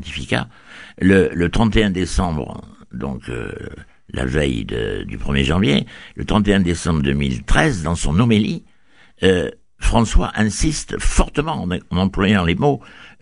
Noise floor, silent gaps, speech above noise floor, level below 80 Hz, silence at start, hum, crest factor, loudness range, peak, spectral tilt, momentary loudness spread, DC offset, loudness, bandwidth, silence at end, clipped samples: -54 dBFS; none; 36 dB; -26 dBFS; 0 s; none; 18 dB; 4 LU; 0 dBFS; -5.5 dB/octave; 14 LU; 0.3%; -19 LUFS; 11 kHz; 0.15 s; under 0.1%